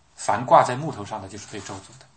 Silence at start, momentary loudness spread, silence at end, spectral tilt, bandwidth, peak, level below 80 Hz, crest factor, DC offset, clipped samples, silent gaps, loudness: 0.2 s; 19 LU; 0.3 s; -5 dB/octave; 8.8 kHz; -2 dBFS; -64 dBFS; 22 dB; under 0.1%; under 0.1%; none; -20 LUFS